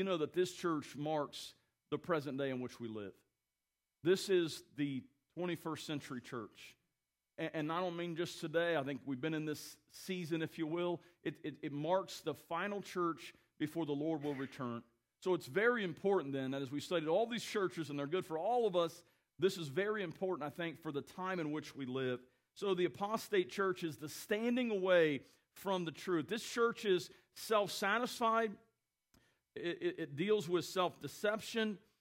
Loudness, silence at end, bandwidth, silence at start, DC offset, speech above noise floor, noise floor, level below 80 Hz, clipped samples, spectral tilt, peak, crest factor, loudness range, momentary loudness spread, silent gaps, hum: -38 LUFS; 0.2 s; 16 kHz; 0 s; under 0.1%; over 52 dB; under -90 dBFS; -82 dBFS; under 0.1%; -5 dB/octave; -20 dBFS; 20 dB; 5 LU; 12 LU; none; none